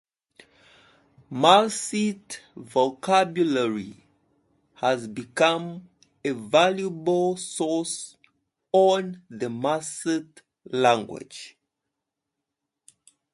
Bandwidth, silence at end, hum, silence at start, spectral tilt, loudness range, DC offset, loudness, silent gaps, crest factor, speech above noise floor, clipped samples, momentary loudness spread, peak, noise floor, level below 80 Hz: 11.5 kHz; 1.85 s; none; 1.3 s; -4 dB/octave; 5 LU; under 0.1%; -24 LUFS; none; 22 dB; 60 dB; under 0.1%; 18 LU; -4 dBFS; -84 dBFS; -72 dBFS